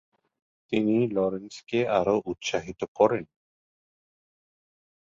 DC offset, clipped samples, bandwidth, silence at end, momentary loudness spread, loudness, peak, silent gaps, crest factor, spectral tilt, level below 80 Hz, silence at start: under 0.1%; under 0.1%; 7.8 kHz; 1.8 s; 8 LU; -26 LUFS; -6 dBFS; 2.88-2.95 s; 22 dB; -5.5 dB/octave; -62 dBFS; 0.7 s